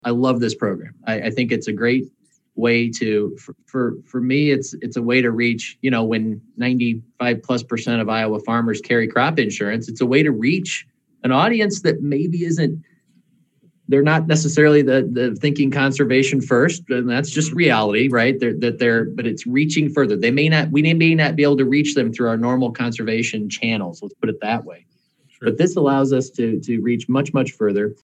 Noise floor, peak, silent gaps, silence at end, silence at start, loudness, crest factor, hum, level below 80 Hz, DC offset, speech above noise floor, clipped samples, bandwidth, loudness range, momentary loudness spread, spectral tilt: -59 dBFS; -2 dBFS; none; 0.1 s; 0.05 s; -19 LUFS; 18 dB; none; -68 dBFS; under 0.1%; 41 dB; under 0.1%; 9 kHz; 5 LU; 8 LU; -5.5 dB/octave